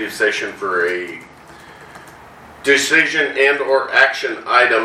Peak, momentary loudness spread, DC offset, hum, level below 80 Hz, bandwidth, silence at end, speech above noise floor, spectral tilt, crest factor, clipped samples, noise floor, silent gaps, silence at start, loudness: 0 dBFS; 11 LU; under 0.1%; none; -58 dBFS; 15 kHz; 0 s; 24 dB; -2 dB/octave; 18 dB; under 0.1%; -40 dBFS; none; 0 s; -15 LUFS